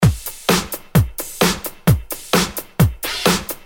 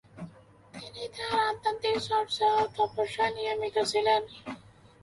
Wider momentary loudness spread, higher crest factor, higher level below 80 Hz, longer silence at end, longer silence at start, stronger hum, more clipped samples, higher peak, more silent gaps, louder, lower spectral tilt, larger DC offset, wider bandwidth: second, 3 LU vs 20 LU; about the same, 18 dB vs 18 dB; first, -32 dBFS vs -64 dBFS; second, 0.05 s vs 0.45 s; second, 0 s vs 0.15 s; neither; neither; first, -2 dBFS vs -12 dBFS; neither; first, -19 LUFS vs -28 LUFS; first, -4.5 dB/octave vs -3 dB/octave; neither; first, over 20 kHz vs 11.5 kHz